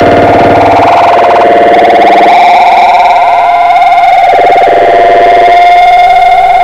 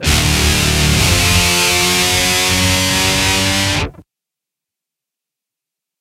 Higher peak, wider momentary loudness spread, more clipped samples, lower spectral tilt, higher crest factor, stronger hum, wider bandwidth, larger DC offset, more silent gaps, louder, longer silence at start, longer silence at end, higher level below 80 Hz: about the same, 0 dBFS vs 0 dBFS; about the same, 2 LU vs 3 LU; first, 10% vs under 0.1%; first, -5 dB/octave vs -2.5 dB/octave; second, 2 dB vs 16 dB; neither; second, 10 kHz vs 16 kHz; first, 2% vs under 0.1%; neither; first, -3 LUFS vs -12 LUFS; about the same, 0 s vs 0 s; second, 0 s vs 2 s; second, -34 dBFS vs -26 dBFS